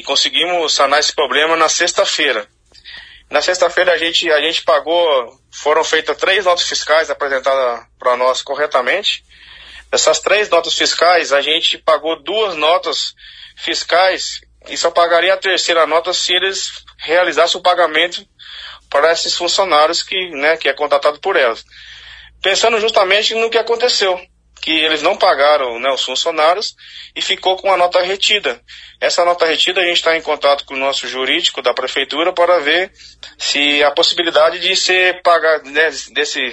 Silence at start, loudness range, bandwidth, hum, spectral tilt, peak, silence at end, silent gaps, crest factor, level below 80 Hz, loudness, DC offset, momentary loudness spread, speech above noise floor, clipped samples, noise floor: 0 s; 2 LU; 10.5 kHz; none; -0.5 dB/octave; 0 dBFS; 0 s; none; 16 dB; -54 dBFS; -14 LUFS; under 0.1%; 8 LU; 22 dB; under 0.1%; -37 dBFS